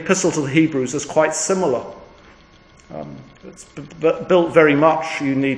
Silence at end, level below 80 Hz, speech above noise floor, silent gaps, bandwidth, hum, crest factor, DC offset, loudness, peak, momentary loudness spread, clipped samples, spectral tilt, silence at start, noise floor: 0 s; -54 dBFS; 30 dB; none; 10.5 kHz; none; 18 dB; under 0.1%; -17 LUFS; 0 dBFS; 23 LU; under 0.1%; -4.5 dB/octave; 0 s; -48 dBFS